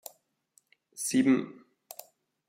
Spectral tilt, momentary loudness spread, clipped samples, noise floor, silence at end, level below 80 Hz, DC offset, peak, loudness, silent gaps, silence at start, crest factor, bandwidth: -4 dB/octave; 23 LU; under 0.1%; -69 dBFS; 0.95 s; -78 dBFS; under 0.1%; -14 dBFS; -28 LUFS; none; 0.95 s; 20 dB; 16 kHz